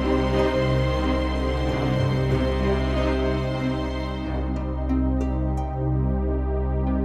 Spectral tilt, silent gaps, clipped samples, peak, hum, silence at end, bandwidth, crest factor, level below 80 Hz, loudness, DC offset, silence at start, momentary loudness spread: -8 dB/octave; none; under 0.1%; -8 dBFS; none; 0 s; 7.8 kHz; 14 dB; -28 dBFS; -24 LUFS; under 0.1%; 0 s; 6 LU